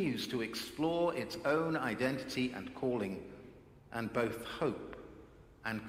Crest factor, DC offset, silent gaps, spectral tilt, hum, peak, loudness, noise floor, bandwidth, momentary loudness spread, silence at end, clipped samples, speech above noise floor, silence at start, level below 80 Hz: 20 dB; under 0.1%; none; -5.5 dB/octave; none; -18 dBFS; -37 LUFS; -57 dBFS; 16.5 kHz; 18 LU; 0 s; under 0.1%; 21 dB; 0 s; -64 dBFS